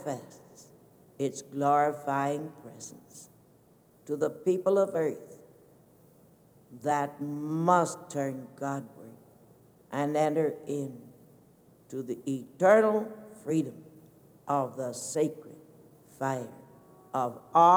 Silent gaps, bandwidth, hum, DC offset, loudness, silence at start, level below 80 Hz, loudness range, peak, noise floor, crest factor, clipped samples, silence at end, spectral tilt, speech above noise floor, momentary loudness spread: none; 18.5 kHz; none; under 0.1%; -30 LUFS; 0 s; -78 dBFS; 5 LU; -8 dBFS; -61 dBFS; 22 dB; under 0.1%; 0 s; -6 dB/octave; 33 dB; 21 LU